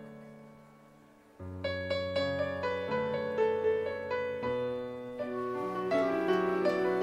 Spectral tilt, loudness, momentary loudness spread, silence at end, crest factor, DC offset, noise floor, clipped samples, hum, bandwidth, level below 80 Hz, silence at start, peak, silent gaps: -6.5 dB/octave; -32 LUFS; 12 LU; 0 s; 16 dB; under 0.1%; -59 dBFS; under 0.1%; none; 12.5 kHz; -66 dBFS; 0 s; -18 dBFS; none